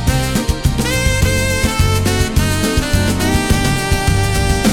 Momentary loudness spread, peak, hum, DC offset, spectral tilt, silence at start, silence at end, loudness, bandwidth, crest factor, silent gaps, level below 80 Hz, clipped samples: 2 LU; -2 dBFS; none; under 0.1%; -4.5 dB/octave; 0 s; 0 s; -15 LUFS; 18 kHz; 12 dB; none; -20 dBFS; under 0.1%